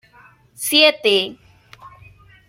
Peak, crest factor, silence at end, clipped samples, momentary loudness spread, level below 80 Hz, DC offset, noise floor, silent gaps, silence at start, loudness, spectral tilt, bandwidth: -2 dBFS; 20 dB; 0.6 s; under 0.1%; 14 LU; -60 dBFS; under 0.1%; -50 dBFS; none; 0.6 s; -15 LUFS; -1.5 dB/octave; 16.5 kHz